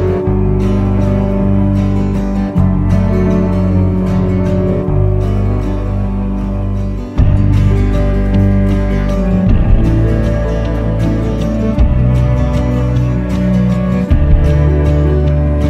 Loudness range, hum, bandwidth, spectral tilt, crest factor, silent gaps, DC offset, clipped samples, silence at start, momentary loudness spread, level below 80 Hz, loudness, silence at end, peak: 2 LU; none; 7.8 kHz; -9.5 dB/octave; 10 dB; none; under 0.1%; under 0.1%; 0 s; 4 LU; -16 dBFS; -13 LUFS; 0 s; 0 dBFS